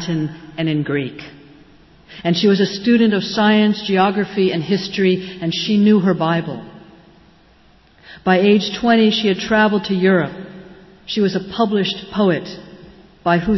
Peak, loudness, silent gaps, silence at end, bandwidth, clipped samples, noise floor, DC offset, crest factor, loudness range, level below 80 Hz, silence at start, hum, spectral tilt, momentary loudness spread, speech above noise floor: -4 dBFS; -17 LUFS; none; 0 s; 6.2 kHz; under 0.1%; -50 dBFS; under 0.1%; 14 dB; 3 LU; -50 dBFS; 0 s; none; -6.5 dB/octave; 12 LU; 34 dB